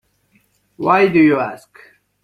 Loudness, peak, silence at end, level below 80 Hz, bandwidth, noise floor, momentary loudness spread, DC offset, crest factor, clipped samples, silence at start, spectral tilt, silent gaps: -15 LUFS; -2 dBFS; 0.65 s; -58 dBFS; 10 kHz; -60 dBFS; 14 LU; under 0.1%; 16 dB; under 0.1%; 0.8 s; -7.5 dB/octave; none